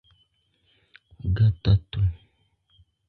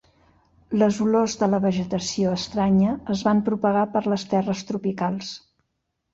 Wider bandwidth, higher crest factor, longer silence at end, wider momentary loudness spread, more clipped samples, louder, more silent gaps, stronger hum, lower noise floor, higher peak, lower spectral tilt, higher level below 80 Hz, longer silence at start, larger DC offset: second, 4.8 kHz vs 7.8 kHz; about the same, 18 dB vs 16 dB; first, 0.9 s vs 0.75 s; first, 12 LU vs 7 LU; neither; about the same, -24 LUFS vs -23 LUFS; neither; neither; second, -68 dBFS vs -77 dBFS; about the same, -8 dBFS vs -8 dBFS; first, -9.5 dB/octave vs -6 dB/octave; first, -38 dBFS vs -54 dBFS; first, 1.25 s vs 0.7 s; neither